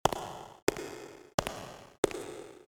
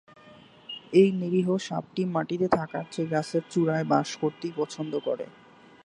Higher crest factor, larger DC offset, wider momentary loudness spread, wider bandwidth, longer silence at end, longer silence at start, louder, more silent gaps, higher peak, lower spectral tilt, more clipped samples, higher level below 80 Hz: first, 28 dB vs 22 dB; neither; about the same, 11 LU vs 12 LU; first, over 20 kHz vs 11 kHz; second, 0.05 s vs 0.55 s; second, 0.05 s vs 0.3 s; second, -36 LUFS vs -27 LUFS; first, 0.62-0.67 s, 1.34-1.38 s, 1.98-2.03 s vs none; about the same, -8 dBFS vs -6 dBFS; second, -3.5 dB/octave vs -6.5 dB/octave; neither; first, -56 dBFS vs -66 dBFS